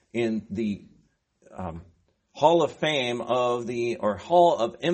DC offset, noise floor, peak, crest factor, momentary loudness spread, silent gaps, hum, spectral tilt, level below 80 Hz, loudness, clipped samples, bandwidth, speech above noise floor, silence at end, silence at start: under 0.1%; -64 dBFS; -4 dBFS; 20 dB; 17 LU; none; none; -5.5 dB/octave; -60 dBFS; -24 LUFS; under 0.1%; 8.4 kHz; 40 dB; 0 s; 0.15 s